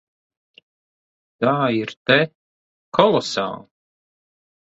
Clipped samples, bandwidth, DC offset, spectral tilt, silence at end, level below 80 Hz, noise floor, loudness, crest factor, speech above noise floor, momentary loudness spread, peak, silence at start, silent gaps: under 0.1%; 8.2 kHz; under 0.1%; -5 dB/octave; 1.05 s; -64 dBFS; under -90 dBFS; -20 LUFS; 22 dB; over 71 dB; 9 LU; 0 dBFS; 1.4 s; 1.97-2.05 s, 2.35-2.92 s